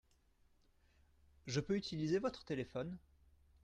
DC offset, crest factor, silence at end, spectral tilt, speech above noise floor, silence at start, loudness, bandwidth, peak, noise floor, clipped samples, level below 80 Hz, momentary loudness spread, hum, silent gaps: under 0.1%; 20 dB; 0.65 s; -6 dB/octave; 33 dB; 1.45 s; -41 LUFS; 9.6 kHz; -24 dBFS; -73 dBFS; under 0.1%; -68 dBFS; 12 LU; none; none